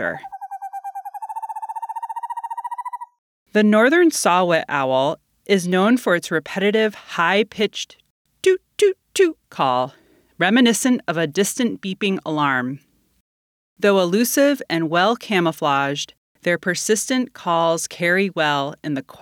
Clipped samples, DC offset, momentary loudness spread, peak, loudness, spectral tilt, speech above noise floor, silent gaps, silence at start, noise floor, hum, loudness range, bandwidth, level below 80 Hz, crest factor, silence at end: under 0.1%; under 0.1%; 14 LU; -2 dBFS; -19 LUFS; -4 dB/octave; over 71 dB; 3.18-3.46 s, 8.10-8.25 s, 13.20-13.76 s, 16.17-16.35 s; 0 s; under -90 dBFS; none; 4 LU; 19.5 kHz; -70 dBFS; 18 dB; 0.05 s